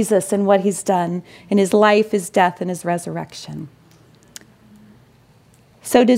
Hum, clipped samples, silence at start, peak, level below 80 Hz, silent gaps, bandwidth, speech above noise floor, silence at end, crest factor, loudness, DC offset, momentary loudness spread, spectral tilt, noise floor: none; under 0.1%; 0 s; 0 dBFS; -60 dBFS; none; 16 kHz; 34 dB; 0 s; 18 dB; -18 LUFS; under 0.1%; 18 LU; -5 dB/octave; -52 dBFS